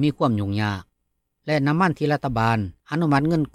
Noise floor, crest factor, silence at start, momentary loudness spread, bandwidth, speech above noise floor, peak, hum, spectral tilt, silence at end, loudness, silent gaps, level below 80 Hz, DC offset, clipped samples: -75 dBFS; 14 dB; 0 s; 7 LU; 13 kHz; 53 dB; -8 dBFS; none; -7.5 dB/octave; 0.05 s; -22 LUFS; none; -50 dBFS; under 0.1%; under 0.1%